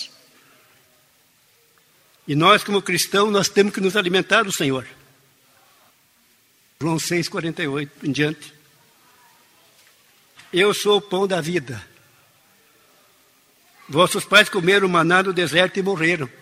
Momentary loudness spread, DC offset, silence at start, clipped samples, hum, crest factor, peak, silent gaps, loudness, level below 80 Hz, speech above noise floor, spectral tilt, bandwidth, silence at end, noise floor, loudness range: 11 LU; under 0.1%; 0 s; under 0.1%; none; 22 dB; 0 dBFS; none; -19 LUFS; -64 dBFS; 40 dB; -4 dB/octave; 16 kHz; 0.15 s; -59 dBFS; 9 LU